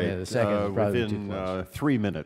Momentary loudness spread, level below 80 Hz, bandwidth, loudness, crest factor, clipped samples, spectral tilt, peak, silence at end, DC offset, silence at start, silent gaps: 6 LU; -52 dBFS; 16 kHz; -27 LUFS; 16 dB; under 0.1%; -7 dB/octave; -10 dBFS; 0 s; under 0.1%; 0 s; none